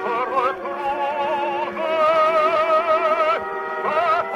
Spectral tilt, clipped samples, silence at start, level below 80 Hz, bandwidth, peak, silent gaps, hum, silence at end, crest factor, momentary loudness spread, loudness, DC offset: -4.5 dB/octave; under 0.1%; 0 s; -60 dBFS; 12 kHz; -8 dBFS; none; none; 0 s; 12 dB; 7 LU; -20 LUFS; under 0.1%